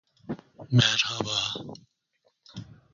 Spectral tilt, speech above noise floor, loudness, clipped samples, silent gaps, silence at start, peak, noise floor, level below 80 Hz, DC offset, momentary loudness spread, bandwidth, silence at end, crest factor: -3.5 dB/octave; 46 dB; -25 LUFS; under 0.1%; none; 0.3 s; -6 dBFS; -72 dBFS; -60 dBFS; under 0.1%; 24 LU; 7.4 kHz; 0.3 s; 24 dB